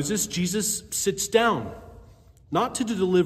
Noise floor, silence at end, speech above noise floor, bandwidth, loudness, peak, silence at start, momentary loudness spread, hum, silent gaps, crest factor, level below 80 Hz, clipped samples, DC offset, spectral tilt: -51 dBFS; 0 s; 27 dB; 16 kHz; -25 LUFS; -6 dBFS; 0 s; 8 LU; none; none; 20 dB; -54 dBFS; under 0.1%; under 0.1%; -4 dB/octave